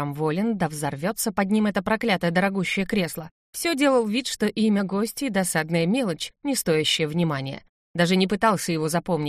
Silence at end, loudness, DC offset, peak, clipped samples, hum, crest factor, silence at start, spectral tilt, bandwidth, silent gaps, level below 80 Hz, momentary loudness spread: 0 s; -23 LUFS; under 0.1%; -6 dBFS; under 0.1%; none; 16 dB; 0 s; -4.5 dB/octave; 15.5 kHz; 3.31-3.53 s, 7.69-7.94 s; -56 dBFS; 7 LU